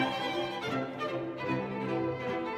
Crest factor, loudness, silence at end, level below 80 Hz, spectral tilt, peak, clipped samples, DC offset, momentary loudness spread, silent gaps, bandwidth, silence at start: 16 dB; -34 LUFS; 0 s; -66 dBFS; -6 dB/octave; -16 dBFS; under 0.1%; under 0.1%; 3 LU; none; 15 kHz; 0 s